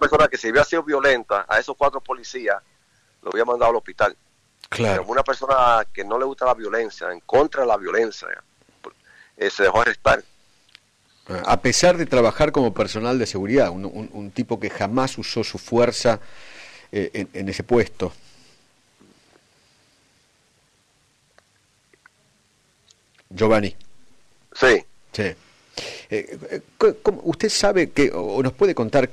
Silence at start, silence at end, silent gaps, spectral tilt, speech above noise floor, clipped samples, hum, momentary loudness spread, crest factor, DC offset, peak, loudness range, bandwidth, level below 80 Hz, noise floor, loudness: 0 s; 0 s; none; -4.5 dB/octave; 42 dB; under 0.1%; none; 14 LU; 16 dB; under 0.1%; -6 dBFS; 8 LU; 14.5 kHz; -44 dBFS; -62 dBFS; -21 LUFS